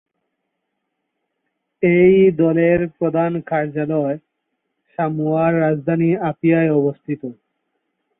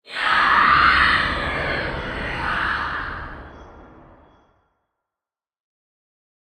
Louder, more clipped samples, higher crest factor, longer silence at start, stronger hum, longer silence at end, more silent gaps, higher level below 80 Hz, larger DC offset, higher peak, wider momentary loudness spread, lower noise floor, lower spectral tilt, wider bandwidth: about the same, -17 LUFS vs -18 LUFS; neither; about the same, 16 dB vs 20 dB; first, 1.8 s vs 0.1 s; neither; second, 0.85 s vs 2.65 s; neither; second, -54 dBFS vs -40 dBFS; neither; about the same, -2 dBFS vs -2 dBFS; about the same, 14 LU vs 16 LU; second, -76 dBFS vs -90 dBFS; first, -13 dB/octave vs -4.5 dB/octave; second, 3.8 kHz vs 11 kHz